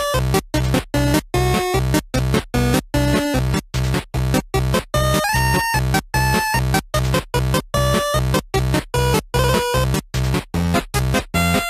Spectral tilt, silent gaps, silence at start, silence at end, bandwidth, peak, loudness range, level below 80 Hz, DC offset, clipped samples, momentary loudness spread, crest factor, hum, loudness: -5 dB/octave; none; 0 s; 0 s; 15.5 kHz; -2 dBFS; 1 LU; -26 dBFS; under 0.1%; under 0.1%; 4 LU; 16 dB; none; -19 LUFS